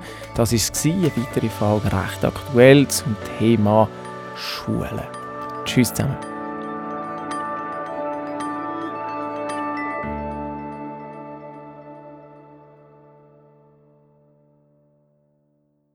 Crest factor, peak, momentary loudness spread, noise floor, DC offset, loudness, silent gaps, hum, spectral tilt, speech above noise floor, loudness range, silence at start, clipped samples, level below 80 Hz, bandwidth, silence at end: 22 dB; 0 dBFS; 18 LU; -66 dBFS; under 0.1%; -22 LUFS; none; none; -5.5 dB/octave; 47 dB; 16 LU; 0 s; under 0.1%; -46 dBFS; 19 kHz; 3.3 s